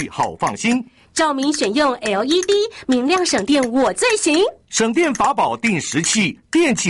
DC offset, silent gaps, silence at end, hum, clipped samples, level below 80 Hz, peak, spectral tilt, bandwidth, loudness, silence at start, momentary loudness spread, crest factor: under 0.1%; none; 0 s; none; under 0.1%; -52 dBFS; -6 dBFS; -3 dB/octave; 11.5 kHz; -18 LUFS; 0 s; 4 LU; 12 dB